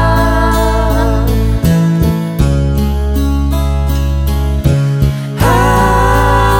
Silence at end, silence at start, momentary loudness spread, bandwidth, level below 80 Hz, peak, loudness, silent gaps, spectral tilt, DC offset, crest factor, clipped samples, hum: 0 s; 0 s; 5 LU; 19.5 kHz; -14 dBFS; 0 dBFS; -12 LUFS; none; -6.5 dB/octave; under 0.1%; 10 dB; under 0.1%; none